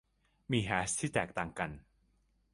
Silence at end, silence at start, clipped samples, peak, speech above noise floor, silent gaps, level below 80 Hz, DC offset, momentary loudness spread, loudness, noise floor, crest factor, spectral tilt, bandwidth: 0.75 s; 0.5 s; under 0.1%; -14 dBFS; 38 dB; none; -58 dBFS; under 0.1%; 8 LU; -35 LUFS; -73 dBFS; 24 dB; -4 dB/octave; 11.5 kHz